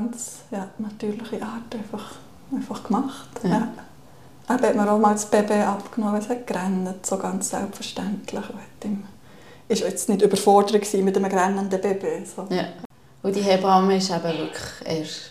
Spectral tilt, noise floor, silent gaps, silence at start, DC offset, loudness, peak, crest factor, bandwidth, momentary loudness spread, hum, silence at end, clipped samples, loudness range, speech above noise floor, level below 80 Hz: -5 dB/octave; -49 dBFS; 12.85-12.90 s; 0 s; 0.3%; -24 LUFS; -4 dBFS; 20 dB; 15.5 kHz; 15 LU; none; 0 s; under 0.1%; 7 LU; 26 dB; -60 dBFS